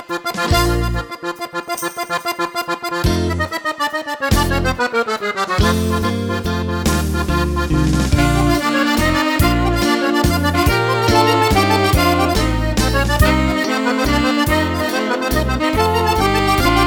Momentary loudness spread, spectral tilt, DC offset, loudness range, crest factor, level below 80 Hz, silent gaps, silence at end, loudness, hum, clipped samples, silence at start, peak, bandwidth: 7 LU; -5 dB/octave; under 0.1%; 5 LU; 16 dB; -24 dBFS; none; 0 s; -17 LUFS; none; under 0.1%; 0 s; 0 dBFS; over 20 kHz